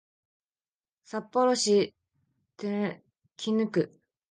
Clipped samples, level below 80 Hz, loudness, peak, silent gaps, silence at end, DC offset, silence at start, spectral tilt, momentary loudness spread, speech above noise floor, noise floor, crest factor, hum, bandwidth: under 0.1%; -80 dBFS; -29 LUFS; -14 dBFS; none; 0.45 s; under 0.1%; 1.15 s; -4.5 dB/octave; 14 LU; over 63 dB; under -90 dBFS; 18 dB; none; 10 kHz